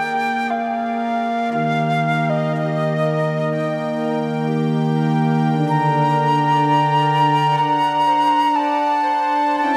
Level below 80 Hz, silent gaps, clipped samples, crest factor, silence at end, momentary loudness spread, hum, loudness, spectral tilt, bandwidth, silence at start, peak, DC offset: -70 dBFS; none; under 0.1%; 12 dB; 0 s; 5 LU; none; -18 LUFS; -7 dB/octave; 11.5 kHz; 0 s; -6 dBFS; under 0.1%